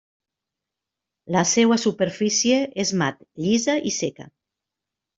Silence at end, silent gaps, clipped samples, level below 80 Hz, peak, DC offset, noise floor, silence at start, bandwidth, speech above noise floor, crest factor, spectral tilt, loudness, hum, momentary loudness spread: 0.9 s; none; under 0.1%; -64 dBFS; -4 dBFS; under 0.1%; -86 dBFS; 1.25 s; 7.8 kHz; 64 dB; 20 dB; -3.5 dB/octave; -21 LUFS; none; 9 LU